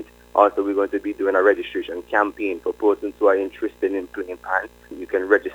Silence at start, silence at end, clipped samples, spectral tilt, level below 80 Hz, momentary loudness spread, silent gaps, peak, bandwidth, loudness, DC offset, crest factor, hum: 0 s; 0 s; under 0.1%; -5.5 dB/octave; -54 dBFS; 10 LU; none; 0 dBFS; 16 kHz; -22 LUFS; under 0.1%; 20 dB; 60 Hz at -55 dBFS